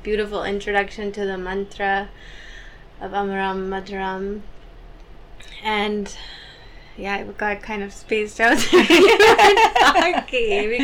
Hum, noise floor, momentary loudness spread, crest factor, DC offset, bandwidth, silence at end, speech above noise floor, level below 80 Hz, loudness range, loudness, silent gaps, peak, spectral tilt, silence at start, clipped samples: none; -41 dBFS; 18 LU; 14 dB; under 0.1%; 18.5 kHz; 0 s; 22 dB; -42 dBFS; 14 LU; -18 LUFS; none; -6 dBFS; -3.5 dB/octave; 0 s; under 0.1%